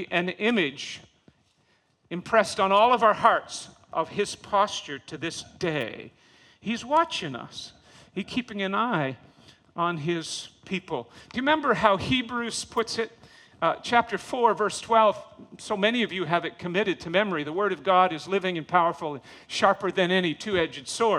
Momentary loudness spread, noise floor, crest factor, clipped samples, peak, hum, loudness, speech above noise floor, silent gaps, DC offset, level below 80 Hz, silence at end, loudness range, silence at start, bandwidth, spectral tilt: 15 LU; -67 dBFS; 22 dB; under 0.1%; -4 dBFS; none; -25 LUFS; 41 dB; none; under 0.1%; -62 dBFS; 0 s; 6 LU; 0 s; 13 kHz; -4 dB/octave